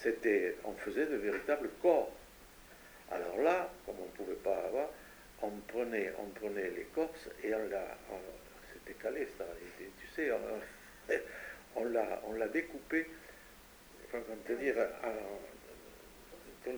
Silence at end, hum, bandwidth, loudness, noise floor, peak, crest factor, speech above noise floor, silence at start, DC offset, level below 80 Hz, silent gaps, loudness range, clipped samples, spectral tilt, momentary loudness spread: 0 s; none; over 20 kHz; -38 LUFS; -58 dBFS; -16 dBFS; 22 dB; 21 dB; 0 s; under 0.1%; -64 dBFS; none; 5 LU; under 0.1%; -4.5 dB/octave; 22 LU